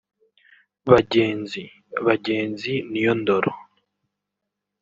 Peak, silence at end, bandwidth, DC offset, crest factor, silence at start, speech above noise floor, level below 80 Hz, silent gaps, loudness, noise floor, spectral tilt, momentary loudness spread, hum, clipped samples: -2 dBFS; 1.2 s; 7.6 kHz; under 0.1%; 22 dB; 0.85 s; 62 dB; -56 dBFS; none; -22 LUFS; -82 dBFS; -7 dB/octave; 15 LU; none; under 0.1%